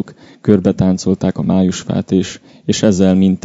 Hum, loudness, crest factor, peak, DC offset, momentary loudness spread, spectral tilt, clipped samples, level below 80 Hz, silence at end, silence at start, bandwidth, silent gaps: none; -14 LUFS; 14 dB; 0 dBFS; under 0.1%; 9 LU; -6.5 dB/octave; 0.2%; -46 dBFS; 0.05 s; 0 s; 8 kHz; none